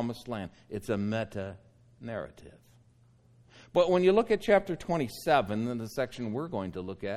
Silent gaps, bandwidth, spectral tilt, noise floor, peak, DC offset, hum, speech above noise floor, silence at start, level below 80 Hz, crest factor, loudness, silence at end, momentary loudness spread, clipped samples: none; 15.5 kHz; -6.5 dB/octave; -62 dBFS; -10 dBFS; under 0.1%; none; 32 dB; 0 s; -58 dBFS; 20 dB; -30 LUFS; 0 s; 16 LU; under 0.1%